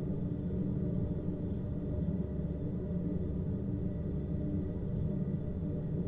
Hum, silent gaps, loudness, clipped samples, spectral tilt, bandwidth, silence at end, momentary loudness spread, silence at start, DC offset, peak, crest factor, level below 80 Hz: none; none; -36 LUFS; under 0.1%; -12.5 dB/octave; 3.7 kHz; 0 s; 2 LU; 0 s; under 0.1%; -22 dBFS; 12 dB; -44 dBFS